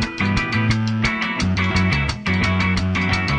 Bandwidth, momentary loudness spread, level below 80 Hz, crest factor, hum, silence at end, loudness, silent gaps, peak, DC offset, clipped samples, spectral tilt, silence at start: 9.6 kHz; 2 LU; -32 dBFS; 14 dB; none; 0 s; -19 LUFS; none; -4 dBFS; under 0.1%; under 0.1%; -5.5 dB/octave; 0 s